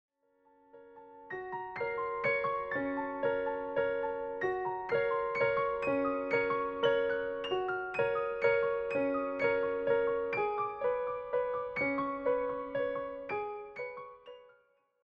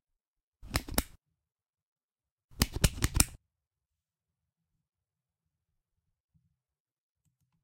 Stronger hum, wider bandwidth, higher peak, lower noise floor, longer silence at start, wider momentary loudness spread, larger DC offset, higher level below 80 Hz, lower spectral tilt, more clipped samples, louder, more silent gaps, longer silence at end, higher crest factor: neither; second, 6 kHz vs 16 kHz; second, -16 dBFS vs 0 dBFS; second, -69 dBFS vs under -90 dBFS; about the same, 0.75 s vs 0.65 s; about the same, 10 LU vs 9 LU; neither; second, -66 dBFS vs -44 dBFS; first, -6.5 dB/octave vs -3 dB/octave; neither; about the same, -33 LUFS vs -31 LUFS; second, none vs 1.82-1.96 s, 2.04-2.08 s, 2.32-2.37 s, 2.44-2.48 s; second, 0.6 s vs 4.25 s; second, 18 dB vs 38 dB